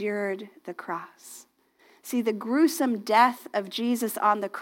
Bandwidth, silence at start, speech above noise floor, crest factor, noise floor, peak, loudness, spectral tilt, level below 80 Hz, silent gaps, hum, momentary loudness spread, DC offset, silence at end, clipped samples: 17 kHz; 0 s; 34 dB; 20 dB; -61 dBFS; -6 dBFS; -26 LUFS; -4 dB/octave; -90 dBFS; none; none; 22 LU; under 0.1%; 0 s; under 0.1%